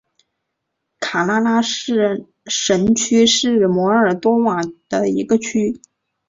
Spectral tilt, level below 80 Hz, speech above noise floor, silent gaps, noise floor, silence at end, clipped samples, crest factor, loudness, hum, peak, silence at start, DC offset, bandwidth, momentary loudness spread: -4 dB/octave; -54 dBFS; 60 dB; none; -76 dBFS; 0.5 s; under 0.1%; 16 dB; -17 LUFS; none; -2 dBFS; 1 s; under 0.1%; 7.8 kHz; 10 LU